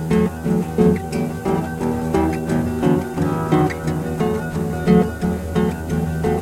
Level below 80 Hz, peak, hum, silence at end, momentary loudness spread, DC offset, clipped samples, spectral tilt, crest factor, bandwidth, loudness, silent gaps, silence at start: -38 dBFS; -2 dBFS; none; 0 s; 6 LU; under 0.1%; under 0.1%; -7.5 dB/octave; 16 dB; 16 kHz; -20 LUFS; none; 0 s